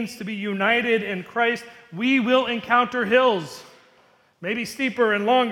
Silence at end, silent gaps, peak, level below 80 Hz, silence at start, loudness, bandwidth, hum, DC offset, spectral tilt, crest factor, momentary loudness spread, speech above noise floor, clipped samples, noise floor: 0 s; none; -4 dBFS; -68 dBFS; 0 s; -22 LUFS; 16.5 kHz; none; under 0.1%; -5 dB/octave; 18 dB; 12 LU; 36 dB; under 0.1%; -58 dBFS